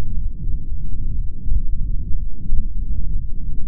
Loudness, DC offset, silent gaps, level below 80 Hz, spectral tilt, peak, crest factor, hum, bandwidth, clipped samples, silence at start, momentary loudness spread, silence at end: -29 LUFS; under 0.1%; none; -20 dBFS; -16 dB/octave; -2 dBFS; 12 dB; none; 0.5 kHz; under 0.1%; 0 s; 4 LU; 0 s